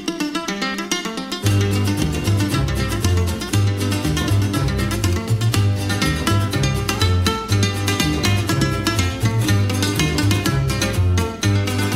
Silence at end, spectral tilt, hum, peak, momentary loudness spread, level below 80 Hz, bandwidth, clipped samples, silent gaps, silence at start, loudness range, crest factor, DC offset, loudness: 0 s; -5 dB/octave; none; -2 dBFS; 3 LU; -32 dBFS; 16 kHz; under 0.1%; none; 0 s; 1 LU; 18 dB; under 0.1%; -19 LUFS